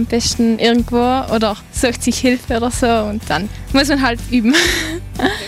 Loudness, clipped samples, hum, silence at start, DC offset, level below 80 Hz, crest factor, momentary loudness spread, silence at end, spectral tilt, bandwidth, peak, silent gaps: -16 LUFS; under 0.1%; none; 0 s; under 0.1%; -30 dBFS; 14 dB; 6 LU; 0 s; -4 dB/octave; 16 kHz; -2 dBFS; none